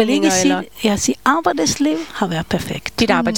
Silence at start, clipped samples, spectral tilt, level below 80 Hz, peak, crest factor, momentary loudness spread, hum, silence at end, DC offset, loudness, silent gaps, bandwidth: 0 s; under 0.1%; -3.5 dB/octave; -44 dBFS; 0 dBFS; 16 dB; 7 LU; none; 0 s; 0.7%; -17 LUFS; none; 18 kHz